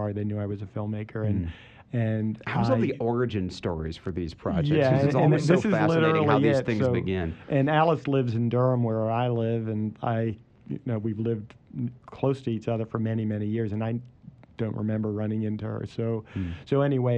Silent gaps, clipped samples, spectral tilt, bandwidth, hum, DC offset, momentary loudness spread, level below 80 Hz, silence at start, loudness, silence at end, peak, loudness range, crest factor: none; under 0.1%; -8.5 dB/octave; 8.8 kHz; none; under 0.1%; 12 LU; -52 dBFS; 0 s; -27 LUFS; 0 s; -6 dBFS; 7 LU; 20 dB